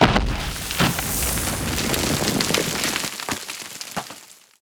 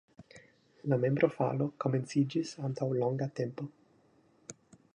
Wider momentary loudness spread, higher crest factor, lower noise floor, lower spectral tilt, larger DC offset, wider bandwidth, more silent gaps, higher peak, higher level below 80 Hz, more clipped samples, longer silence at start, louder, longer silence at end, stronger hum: second, 11 LU vs 19 LU; about the same, 22 dB vs 22 dB; second, -45 dBFS vs -66 dBFS; second, -3 dB/octave vs -7.5 dB/octave; neither; first, over 20 kHz vs 10 kHz; neither; first, 0 dBFS vs -12 dBFS; first, -34 dBFS vs -76 dBFS; neither; second, 0 s vs 0.2 s; first, -22 LUFS vs -32 LUFS; second, 0.3 s vs 0.45 s; neither